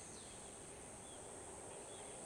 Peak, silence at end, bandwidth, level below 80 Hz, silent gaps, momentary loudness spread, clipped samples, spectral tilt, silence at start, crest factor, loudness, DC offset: -42 dBFS; 0 s; 16 kHz; -70 dBFS; none; 2 LU; under 0.1%; -2.5 dB/octave; 0 s; 12 dB; -52 LUFS; under 0.1%